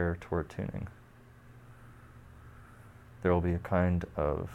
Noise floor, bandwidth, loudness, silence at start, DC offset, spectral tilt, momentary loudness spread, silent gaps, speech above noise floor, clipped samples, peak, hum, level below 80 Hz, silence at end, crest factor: -55 dBFS; 8.2 kHz; -32 LUFS; 0 s; under 0.1%; -9 dB/octave; 25 LU; none; 24 dB; under 0.1%; -14 dBFS; none; -48 dBFS; 0 s; 20 dB